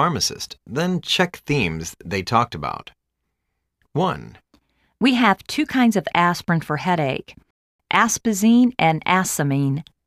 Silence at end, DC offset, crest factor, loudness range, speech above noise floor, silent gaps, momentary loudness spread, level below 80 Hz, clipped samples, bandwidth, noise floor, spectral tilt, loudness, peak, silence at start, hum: 0.25 s; under 0.1%; 18 dB; 6 LU; 57 dB; 7.50-7.79 s; 12 LU; -52 dBFS; under 0.1%; 15.5 kHz; -77 dBFS; -4.5 dB/octave; -20 LUFS; -2 dBFS; 0 s; none